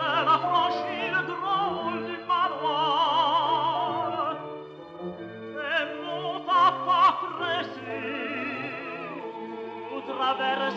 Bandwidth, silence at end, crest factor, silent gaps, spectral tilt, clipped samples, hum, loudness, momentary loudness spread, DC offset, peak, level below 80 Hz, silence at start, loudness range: 7.6 kHz; 0 s; 18 dB; none; -5 dB/octave; under 0.1%; none; -26 LUFS; 15 LU; under 0.1%; -10 dBFS; -74 dBFS; 0 s; 4 LU